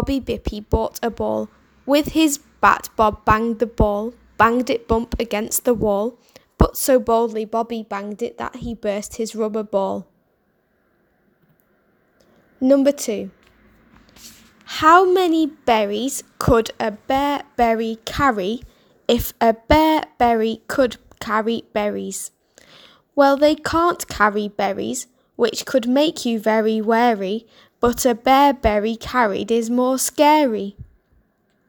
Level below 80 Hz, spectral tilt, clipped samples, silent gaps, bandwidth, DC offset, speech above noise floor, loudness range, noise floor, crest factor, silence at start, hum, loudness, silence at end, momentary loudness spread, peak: -38 dBFS; -4.5 dB/octave; under 0.1%; none; over 20 kHz; under 0.1%; 46 dB; 6 LU; -64 dBFS; 20 dB; 0 s; none; -19 LUFS; 0.85 s; 12 LU; 0 dBFS